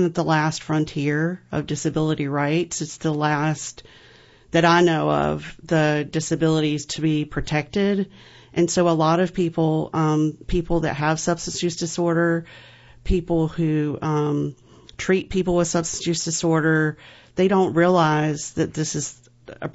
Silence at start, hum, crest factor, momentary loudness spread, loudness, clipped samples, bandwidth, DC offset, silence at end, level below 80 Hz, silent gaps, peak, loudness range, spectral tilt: 0 s; none; 18 dB; 8 LU; -22 LUFS; under 0.1%; 8 kHz; under 0.1%; 0.05 s; -40 dBFS; none; -4 dBFS; 3 LU; -5.5 dB/octave